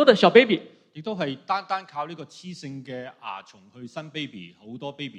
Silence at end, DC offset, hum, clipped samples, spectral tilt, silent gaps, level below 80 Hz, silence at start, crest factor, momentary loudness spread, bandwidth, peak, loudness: 0 s; under 0.1%; none; under 0.1%; -5.5 dB/octave; none; -74 dBFS; 0 s; 24 dB; 23 LU; 9 kHz; 0 dBFS; -23 LUFS